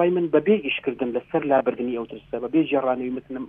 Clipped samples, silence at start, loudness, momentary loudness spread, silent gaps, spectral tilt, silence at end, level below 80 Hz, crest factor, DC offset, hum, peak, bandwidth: under 0.1%; 0 s; -23 LUFS; 10 LU; none; -9.5 dB/octave; 0 s; -60 dBFS; 18 dB; under 0.1%; none; -6 dBFS; 3.8 kHz